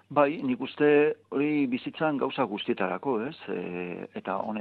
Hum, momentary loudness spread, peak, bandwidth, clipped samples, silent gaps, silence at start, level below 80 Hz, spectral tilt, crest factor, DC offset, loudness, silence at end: none; 12 LU; -8 dBFS; 4.6 kHz; under 0.1%; none; 0.1 s; -72 dBFS; -9 dB/octave; 20 dB; under 0.1%; -28 LUFS; 0 s